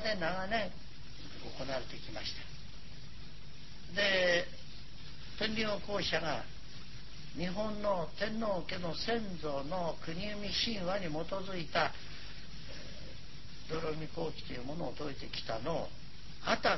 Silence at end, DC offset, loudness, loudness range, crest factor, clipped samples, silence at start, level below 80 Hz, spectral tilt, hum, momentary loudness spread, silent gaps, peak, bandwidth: 0 s; 1%; -37 LUFS; 7 LU; 24 dB; under 0.1%; 0 s; -54 dBFS; -4.5 dB/octave; none; 17 LU; none; -16 dBFS; 6.2 kHz